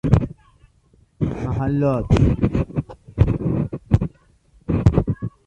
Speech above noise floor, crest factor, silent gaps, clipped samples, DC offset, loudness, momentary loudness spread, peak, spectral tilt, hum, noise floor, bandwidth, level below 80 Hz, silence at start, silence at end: 38 dB; 18 dB; none; under 0.1%; under 0.1%; -21 LUFS; 11 LU; -4 dBFS; -9.5 dB/octave; none; -57 dBFS; 8.4 kHz; -30 dBFS; 0.05 s; 0.15 s